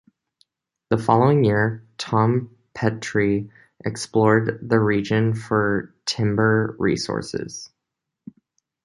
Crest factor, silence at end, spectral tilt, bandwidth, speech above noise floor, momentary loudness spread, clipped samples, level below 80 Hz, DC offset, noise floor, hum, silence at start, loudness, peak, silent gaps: 20 dB; 1.2 s; -6.5 dB/octave; 11.5 kHz; 62 dB; 13 LU; under 0.1%; -52 dBFS; under 0.1%; -82 dBFS; none; 0.9 s; -21 LUFS; -2 dBFS; none